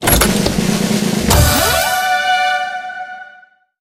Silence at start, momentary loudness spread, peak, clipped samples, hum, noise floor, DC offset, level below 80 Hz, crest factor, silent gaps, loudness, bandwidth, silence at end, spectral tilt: 0 s; 15 LU; 0 dBFS; under 0.1%; none; -45 dBFS; under 0.1%; -26 dBFS; 14 dB; none; -14 LUFS; 17 kHz; 0.5 s; -3.5 dB/octave